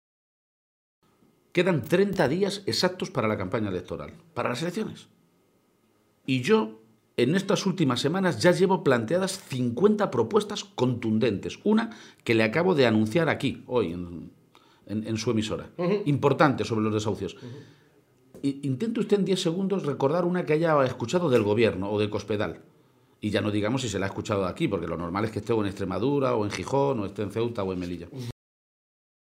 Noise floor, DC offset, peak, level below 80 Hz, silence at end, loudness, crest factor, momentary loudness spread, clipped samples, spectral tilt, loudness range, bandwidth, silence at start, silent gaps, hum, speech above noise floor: -66 dBFS; under 0.1%; -6 dBFS; -60 dBFS; 0.95 s; -26 LUFS; 20 dB; 12 LU; under 0.1%; -6 dB/octave; 5 LU; 16 kHz; 1.55 s; none; none; 40 dB